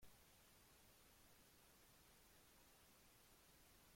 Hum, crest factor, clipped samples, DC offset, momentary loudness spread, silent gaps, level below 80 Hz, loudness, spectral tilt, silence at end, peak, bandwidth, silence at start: none; 16 dB; under 0.1%; under 0.1%; 0 LU; none; -80 dBFS; -70 LUFS; -2.5 dB/octave; 0 s; -54 dBFS; 16.5 kHz; 0 s